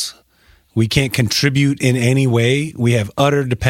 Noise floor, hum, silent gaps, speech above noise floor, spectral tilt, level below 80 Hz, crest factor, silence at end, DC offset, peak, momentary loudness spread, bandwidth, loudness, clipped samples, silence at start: -53 dBFS; none; none; 38 dB; -5.5 dB/octave; -42 dBFS; 16 dB; 0 s; under 0.1%; 0 dBFS; 3 LU; 16.5 kHz; -16 LUFS; under 0.1%; 0 s